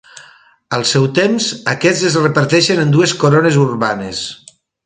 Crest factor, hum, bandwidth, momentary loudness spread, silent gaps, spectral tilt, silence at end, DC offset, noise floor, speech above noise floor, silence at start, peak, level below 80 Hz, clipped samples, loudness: 14 dB; none; 9.6 kHz; 9 LU; none; -4.5 dB/octave; 0.5 s; under 0.1%; -45 dBFS; 31 dB; 0.15 s; 0 dBFS; -54 dBFS; under 0.1%; -13 LUFS